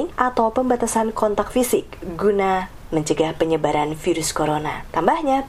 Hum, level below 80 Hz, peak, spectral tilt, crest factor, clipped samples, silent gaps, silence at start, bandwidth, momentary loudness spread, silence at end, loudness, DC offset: none; -42 dBFS; 0 dBFS; -4.5 dB/octave; 20 dB; under 0.1%; none; 0 s; 16 kHz; 6 LU; 0 s; -21 LUFS; under 0.1%